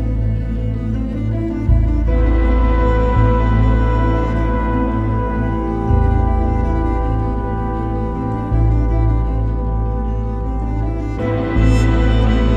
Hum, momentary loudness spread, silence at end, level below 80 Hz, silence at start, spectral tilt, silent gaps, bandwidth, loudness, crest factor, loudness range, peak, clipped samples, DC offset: none; 6 LU; 0 s; -18 dBFS; 0 s; -9 dB/octave; none; 7 kHz; -18 LUFS; 14 dB; 3 LU; -2 dBFS; under 0.1%; under 0.1%